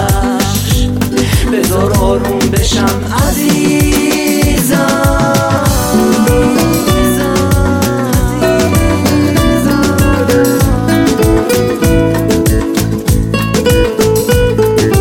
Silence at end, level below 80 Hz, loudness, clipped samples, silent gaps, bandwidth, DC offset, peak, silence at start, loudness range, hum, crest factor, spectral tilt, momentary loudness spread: 0 s; -20 dBFS; -11 LUFS; under 0.1%; none; 17 kHz; under 0.1%; 0 dBFS; 0 s; 1 LU; none; 10 dB; -5.5 dB/octave; 3 LU